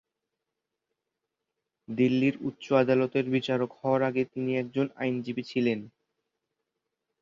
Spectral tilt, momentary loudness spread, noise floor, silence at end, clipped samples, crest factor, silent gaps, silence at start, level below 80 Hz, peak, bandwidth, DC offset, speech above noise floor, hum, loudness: -7.5 dB/octave; 8 LU; -86 dBFS; 1.35 s; under 0.1%; 20 dB; none; 1.9 s; -72 dBFS; -10 dBFS; 7.2 kHz; under 0.1%; 59 dB; none; -28 LUFS